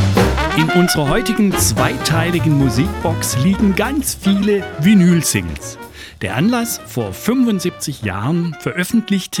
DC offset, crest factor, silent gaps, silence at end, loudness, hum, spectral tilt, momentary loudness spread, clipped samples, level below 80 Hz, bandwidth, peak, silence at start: under 0.1%; 16 dB; none; 0 s; -16 LUFS; none; -5 dB/octave; 9 LU; under 0.1%; -32 dBFS; 18 kHz; 0 dBFS; 0 s